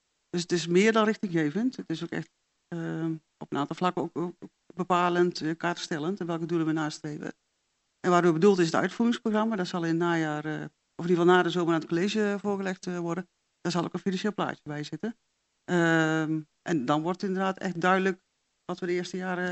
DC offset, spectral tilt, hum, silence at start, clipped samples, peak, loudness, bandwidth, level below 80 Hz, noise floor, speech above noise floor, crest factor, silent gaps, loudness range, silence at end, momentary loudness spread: under 0.1%; -6 dB/octave; none; 0.35 s; under 0.1%; -8 dBFS; -28 LUFS; 8.2 kHz; -76 dBFS; -76 dBFS; 49 dB; 20 dB; none; 5 LU; 0 s; 14 LU